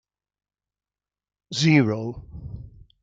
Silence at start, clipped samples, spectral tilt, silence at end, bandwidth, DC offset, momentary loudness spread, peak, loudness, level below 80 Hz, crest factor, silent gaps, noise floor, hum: 1.5 s; under 0.1%; -5.5 dB/octave; 0.35 s; 7.8 kHz; under 0.1%; 21 LU; -6 dBFS; -21 LUFS; -50 dBFS; 22 dB; none; under -90 dBFS; none